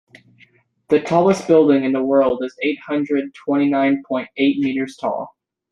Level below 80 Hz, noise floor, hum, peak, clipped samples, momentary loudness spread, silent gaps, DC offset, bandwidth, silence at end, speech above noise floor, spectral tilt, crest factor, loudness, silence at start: -60 dBFS; -55 dBFS; none; -2 dBFS; under 0.1%; 10 LU; none; under 0.1%; 9.6 kHz; 0.45 s; 37 dB; -6.5 dB/octave; 16 dB; -18 LUFS; 0.9 s